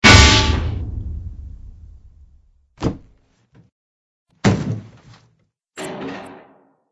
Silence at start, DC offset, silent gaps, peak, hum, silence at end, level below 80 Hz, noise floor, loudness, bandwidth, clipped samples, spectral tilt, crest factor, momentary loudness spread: 0 s; under 0.1%; 3.72-4.26 s; 0 dBFS; none; 0.55 s; -28 dBFS; -63 dBFS; -17 LUFS; 11 kHz; under 0.1%; -3.5 dB/octave; 20 dB; 27 LU